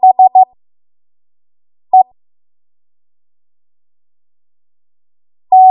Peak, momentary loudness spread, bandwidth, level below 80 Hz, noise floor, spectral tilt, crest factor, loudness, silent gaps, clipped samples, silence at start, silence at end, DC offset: 0 dBFS; 7 LU; 1.1 kHz; -74 dBFS; under -90 dBFS; -9 dB/octave; 14 dB; -10 LUFS; none; under 0.1%; 0.05 s; 0 s; under 0.1%